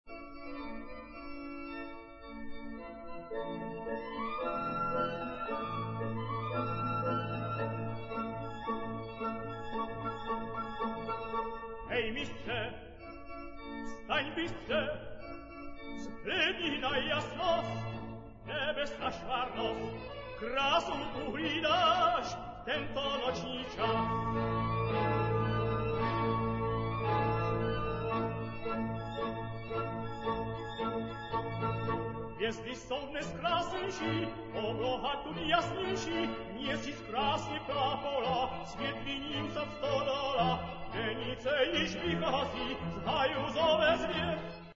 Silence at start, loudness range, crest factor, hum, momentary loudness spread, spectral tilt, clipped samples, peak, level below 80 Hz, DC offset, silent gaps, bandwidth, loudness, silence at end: 0.05 s; 6 LU; 20 dB; none; 13 LU; -3.5 dB/octave; under 0.1%; -14 dBFS; -52 dBFS; under 0.1%; none; 7.4 kHz; -35 LUFS; 0 s